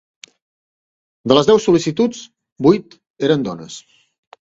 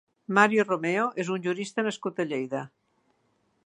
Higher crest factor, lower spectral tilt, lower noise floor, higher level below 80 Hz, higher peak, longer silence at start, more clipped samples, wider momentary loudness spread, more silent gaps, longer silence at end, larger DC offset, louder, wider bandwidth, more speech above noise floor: second, 18 dB vs 24 dB; about the same, -5.5 dB/octave vs -5 dB/octave; first, under -90 dBFS vs -71 dBFS; first, -56 dBFS vs -80 dBFS; first, 0 dBFS vs -4 dBFS; first, 1.25 s vs 0.3 s; neither; first, 20 LU vs 11 LU; first, 2.52-2.56 s, 3.10-3.14 s vs none; second, 0.8 s vs 1 s; neither; first, -16 LUFS vs -27 LUFS; second, 8 kHz vs 11 kHz; first, over 74 dB vs 44 dB